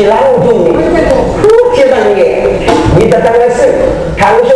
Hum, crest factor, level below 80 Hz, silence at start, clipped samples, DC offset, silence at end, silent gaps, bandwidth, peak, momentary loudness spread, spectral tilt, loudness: none; 6 dB; -24 dBFS; 0 s; 3%; under 0.1%; 0 s; none; 11 kHz; 0 dBFS; 3 LU; -6.5 dB/octave; -7 LUFS